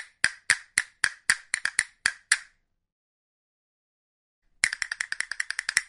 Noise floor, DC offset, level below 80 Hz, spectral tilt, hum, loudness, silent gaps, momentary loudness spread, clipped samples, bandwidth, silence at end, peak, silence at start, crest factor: -59 dBFS; under 0.1%; -66 dBFS; 2.5 dB/octave; none; -27 LUFS; 2.92-4.42 s; 6 LU; under 0.1%; 12 kHz; 0.05 s; -2 dBFS; 0 s; 30 dB